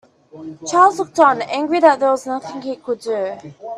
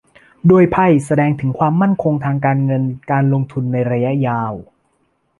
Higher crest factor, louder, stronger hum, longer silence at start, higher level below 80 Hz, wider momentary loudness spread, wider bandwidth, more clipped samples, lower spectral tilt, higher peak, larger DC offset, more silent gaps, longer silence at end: about the same, 18 dB vs 14 dB; about the same, -17 LUFS vs -16 LUFS; neither; about the same, 0.35 s vs 0.45 s; second, -66 dBFS vs -48 dBFS; first, 16 LU vs 8 LU; about the same, 12.5 kHz vs 11.5 kHz; neither; second, -4 dB/octave vs -9 dB/octave; about the same, 0 dBFS vs -2 dBFS; neither; neither; second, 0 s vs 0.75 s